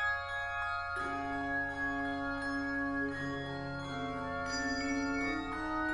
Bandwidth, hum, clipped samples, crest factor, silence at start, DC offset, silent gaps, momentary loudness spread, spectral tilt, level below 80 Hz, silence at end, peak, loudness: 11 kHz; none; under 0.1%; 12 dB; 0 s; under 0.1%; none; 4 LU; -4.5 dB/octave; -54 dBFS; 0 s; -24 dBFS; -36 LUFS